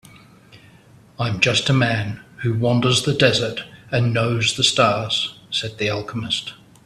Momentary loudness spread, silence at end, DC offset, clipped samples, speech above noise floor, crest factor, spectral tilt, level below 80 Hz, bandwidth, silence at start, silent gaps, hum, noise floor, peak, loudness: 10 LU; 0.3 s; under 0.1%; under 0.1%; 29 dB; 20 dB; -4 dB/octave; -52 dBFS; 13 kHz; 0.55 s; none; none; -49 dBFS; 0 dBFS; -19 LUFS